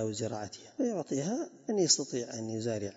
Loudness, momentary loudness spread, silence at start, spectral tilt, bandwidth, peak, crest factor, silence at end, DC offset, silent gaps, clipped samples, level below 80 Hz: -32 LUFS; 11 LU; 0 s; -5 dB/octave; 7.6 kHz; -12 dBFS; 20 dB; 0 s; under 0.1%; none; under 0.1%; -76 dBFS